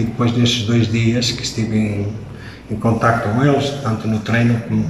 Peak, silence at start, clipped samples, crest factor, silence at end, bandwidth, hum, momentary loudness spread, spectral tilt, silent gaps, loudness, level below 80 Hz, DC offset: -2 dBFS; 0 s; under 0.1%; 16 dB; 0 s; 12.5 kHz; none; 10 LU; -5.5 dB/octave; none; -17 LUFS; -42 dBFS; 0.1%